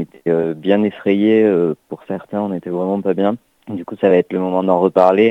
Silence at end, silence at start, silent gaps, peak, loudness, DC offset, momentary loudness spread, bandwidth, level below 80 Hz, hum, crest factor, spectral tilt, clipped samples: 0 s; 0 s; none; 0 dBFS; -16 LUFS; under 0.1%; 15 LU; 5.6 kHz; -62 dBFS; none; 16 dB; -9 dB/octave; under 0.1%